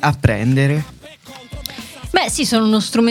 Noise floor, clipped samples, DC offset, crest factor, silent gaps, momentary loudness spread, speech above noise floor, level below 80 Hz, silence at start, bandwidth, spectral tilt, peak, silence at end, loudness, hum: -38 dBFS; under 0.1%; under 0.1%; 18 dB; none; 18 LU; 23 dB; -38 dBFS; 0 s; 16.5 kHz; -5 dB/octave; 0 dBFS; 0 s; -16 LUFS; none